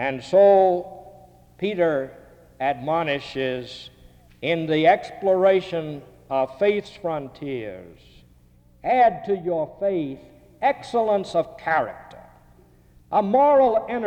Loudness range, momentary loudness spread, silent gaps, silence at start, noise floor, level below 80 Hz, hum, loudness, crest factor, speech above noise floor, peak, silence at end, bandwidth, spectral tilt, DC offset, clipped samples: 5 LU; 15 LU; none; 0 s; -54 dBFS; -56 dBFS; 60 Hz at -60 dBFS; -22 LUFS; 16 dB; 33 dB; -6 dBFS; 0 s; 9 kHz; -6.5 dB/octave; under 0.1%; under 0.1%